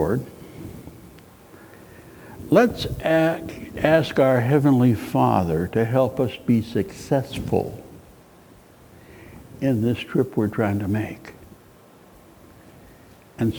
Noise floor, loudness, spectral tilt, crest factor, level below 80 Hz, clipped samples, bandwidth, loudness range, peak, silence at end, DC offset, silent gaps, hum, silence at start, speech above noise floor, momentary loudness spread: -50 dBFS; -21 LUFS; -7.5 dB/octave; 20 dB; -48 dBFS; under 0.1%; over 20 kHz; 8 LU; -2 dBFS; 0 s; under 0.1%; none; none; 0 s; 29 dB; 22 LU